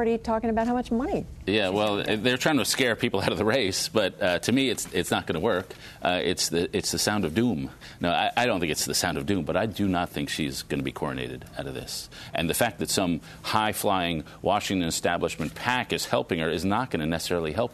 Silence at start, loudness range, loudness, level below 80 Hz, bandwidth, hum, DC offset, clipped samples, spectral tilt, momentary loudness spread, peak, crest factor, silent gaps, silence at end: 0 s; 4 LU; -26 LUFS; -50 dBFS; 13.5 kHz; none; under 0.1%; under 0.1%; -4 dB/octave; 7 LU; -6 dBFS; 20 dB; none; 0 s